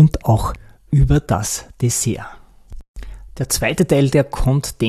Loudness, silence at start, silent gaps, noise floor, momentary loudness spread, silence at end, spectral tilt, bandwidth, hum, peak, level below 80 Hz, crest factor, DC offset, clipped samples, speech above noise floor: -18 LUFS; 0 s; 2.88-2.94 s; -36 dBFS; 22 LU; 0 s; -5.5 dB/octave; 14 kHz; none; -2 dBFS; -28 dBFS; 16 dB; under 0.1%; under 0.1%; 19 dB